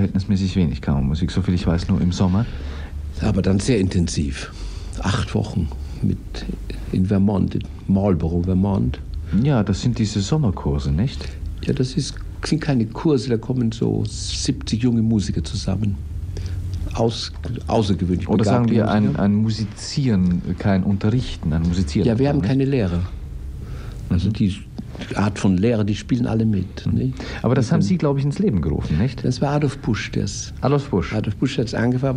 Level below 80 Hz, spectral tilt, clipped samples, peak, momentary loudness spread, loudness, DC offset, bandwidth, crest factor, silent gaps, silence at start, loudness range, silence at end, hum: -32 dBFS; -7 dB/octave; under 0.1%; -4 dBFS; 10 LU; -21 LUFS; under 0.1%; 10.5 kHz; 16 dB; none; 0 s; 3 LU; 0 s; none